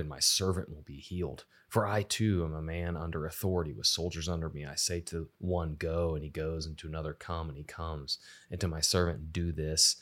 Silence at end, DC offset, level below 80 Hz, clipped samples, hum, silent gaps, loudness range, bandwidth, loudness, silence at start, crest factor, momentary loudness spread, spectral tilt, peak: 0 s; under 0.1%; -50 dBFS; under 0.1%; none; none; 4 LU; 16.5 kHz; -33 LUFS; 0 s; 22 dB; 12 LU; -3.5 dB/octave; -12 dBFS